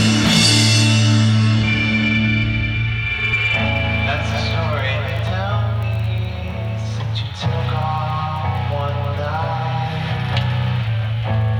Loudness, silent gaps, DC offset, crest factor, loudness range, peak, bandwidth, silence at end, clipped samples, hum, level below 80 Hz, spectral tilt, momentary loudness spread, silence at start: -18 LUFS; none; under 0.1%; 16 dB; 7 LU; -2 dBFS; 12.5 kHz; 0 s; under 0.1%; none; -34 dBFS; -4.5 dB/octave; 9 LU; 0 s